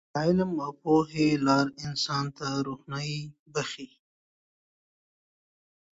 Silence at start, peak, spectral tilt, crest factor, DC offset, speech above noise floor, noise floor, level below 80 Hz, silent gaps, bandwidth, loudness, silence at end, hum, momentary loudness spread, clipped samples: 0.15 s; -10 dBFS; -5.5 dB/octave; 18 dB; under 0.1%; over 62 dB; under -90 dBFS; -62 dBFS; 3.39-3.46 s; 8 kHz; -28 LUFS; 2.05 s; none; 11 LU; under 0.1%